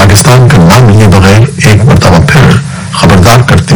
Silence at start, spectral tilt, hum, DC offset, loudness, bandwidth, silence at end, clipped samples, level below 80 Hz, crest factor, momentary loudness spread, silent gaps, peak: 0 s; -5.5 dB/octave; none; under 0.1%; -3 LUFS; over 20 kHz; 0 s; 50%; -20 dBFS; 2 dB; 4 LU; none; 0 dBFS